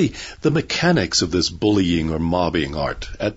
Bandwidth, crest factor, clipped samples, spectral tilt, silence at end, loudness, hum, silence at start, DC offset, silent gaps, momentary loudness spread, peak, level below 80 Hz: 8 kHz; 16 dB; under 0.1%; -4.5 dB/octave; 0 s; -20 LUFS; none; 0 s; under 0.1%; none; 7 LU; -4 dBFS; -38 dBFS